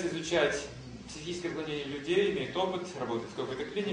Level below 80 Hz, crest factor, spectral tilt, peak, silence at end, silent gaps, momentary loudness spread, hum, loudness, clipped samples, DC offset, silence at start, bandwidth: -58 dBFS; 18 dB; -4.5 dB/octave; -14 dBFS; 0 s; none; 12 LU; none; -33 LUFS; under 0.1%; under 0.1%; 0 s; 10.5 kHz